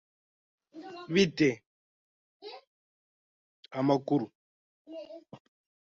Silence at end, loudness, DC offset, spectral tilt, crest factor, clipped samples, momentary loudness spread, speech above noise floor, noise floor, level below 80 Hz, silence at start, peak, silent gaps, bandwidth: 0.6 s; -29 LUFS; under 0.1%; -6 dB/octave; 22 dB; under 0.1%; 22 LU; over 63 dB; under -90 dBFS; -72 dBFS; 0.75 s; -12 dBFS; 1.66-2.40 s, 2.67-3.63 s, 4.35-4.85 s; 7.8 kHz